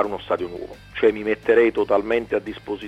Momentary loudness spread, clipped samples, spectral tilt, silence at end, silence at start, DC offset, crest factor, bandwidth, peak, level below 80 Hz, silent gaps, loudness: 14 LU; under 0.1%; -6.5 dB/octave; 0 s; 0 s; under 0.1%; 16 dB; 8 kHz; -4 dBFS; -50 dBFS; none; -21 LUFS